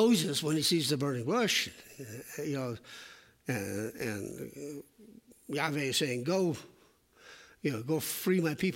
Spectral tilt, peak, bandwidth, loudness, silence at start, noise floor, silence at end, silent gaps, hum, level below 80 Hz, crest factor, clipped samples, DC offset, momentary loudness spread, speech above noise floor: -4 dB/octave; -14 dBFS; 16.5 kHz; -32 LUFS; 0 s; -64 dBFS; 0 s; none; none; -72 dBFS; 18 dB; under 0.1%; under 0.1%; 17 LU; 32 dB